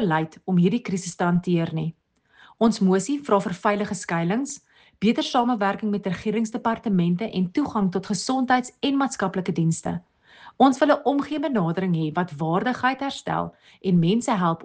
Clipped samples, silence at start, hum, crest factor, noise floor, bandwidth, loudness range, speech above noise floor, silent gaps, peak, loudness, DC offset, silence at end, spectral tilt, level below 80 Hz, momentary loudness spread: under 0.1%; 0 s; none; 18 dB; -55 dBFS; 9.6 kHz; 2 LU; 33 dB; none; -6 dBFS; -23 LUFS; under 0.1%; 0 s; -6 dB/octave; -60 dBFS; 7 LU